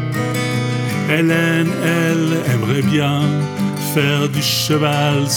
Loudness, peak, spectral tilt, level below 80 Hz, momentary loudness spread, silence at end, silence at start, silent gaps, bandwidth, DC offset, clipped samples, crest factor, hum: -16 LUFS; -2 dBFS; -5 dB/octave; -58 dBFS; 4 LU; 0 s; 0 s; none; 19.5 kHz; under 0.1%; under 0.1%; 16 dB; none